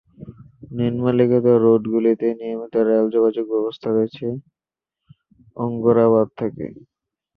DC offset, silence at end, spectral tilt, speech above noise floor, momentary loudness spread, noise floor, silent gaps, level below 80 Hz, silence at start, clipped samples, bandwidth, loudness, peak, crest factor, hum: under 0.1%; 0.6 s; -11 dB/octave; 68 dB; 13 LU; -86 dBFS; none; -58 dBFS; 0.2 s; under 0.1%; 4.8 kHz; -19 LUFS; -4 dBFS; 16 dB; none